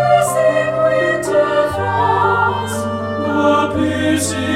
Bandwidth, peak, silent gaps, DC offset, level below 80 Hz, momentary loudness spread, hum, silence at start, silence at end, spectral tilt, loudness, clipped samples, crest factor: 16 kHz; 0 dBFS; none; under 0.1%; -46 dBFS; 6 LU; none; 0 s; 0 s; -5 dB/octave; -15 LUFS; under 0.1%; 14 dB